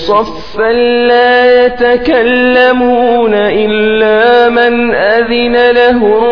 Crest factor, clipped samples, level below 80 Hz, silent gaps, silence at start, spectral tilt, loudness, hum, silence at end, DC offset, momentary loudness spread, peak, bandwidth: 8 dB; 0.6%; -38 dBFS; none; 0 s; -6 dB/octave; -8 LUFS; none; 0 s; 3%; 4 LU; 0 dBFS; 5.4 kHz